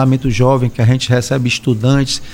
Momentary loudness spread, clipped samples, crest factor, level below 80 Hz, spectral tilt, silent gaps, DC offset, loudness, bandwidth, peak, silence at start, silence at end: 2 LU; under 0.1%; 12 dB; -32 dBFS; -6 dB/octave; none; under 0.1%; -14 LUFS; 15.5 kHz; 0 dBFS; 0 s; 0 s